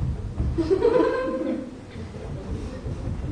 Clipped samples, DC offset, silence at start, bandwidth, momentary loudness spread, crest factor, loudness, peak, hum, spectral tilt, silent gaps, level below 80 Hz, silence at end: under 0.1%; under 0.1%; 0 s; 10.5 kHz; 16 LU; 18 dB; -26 LUFS; -8 dBFS; none; -8 dB/octave; none; -36 dBFS; 0 s